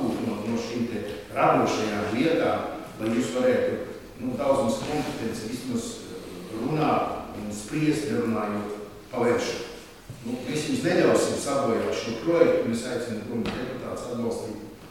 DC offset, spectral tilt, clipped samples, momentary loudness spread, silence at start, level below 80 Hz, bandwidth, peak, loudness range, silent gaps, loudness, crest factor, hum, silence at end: 0.1%; -5.5 dB/octave; under 0.1%; 13 LU; 0 s; -54 dBFS; 16.5 kHz; -6 dBFS; 4 LU; none; -26 LUFS; 22 dB; none; 0 s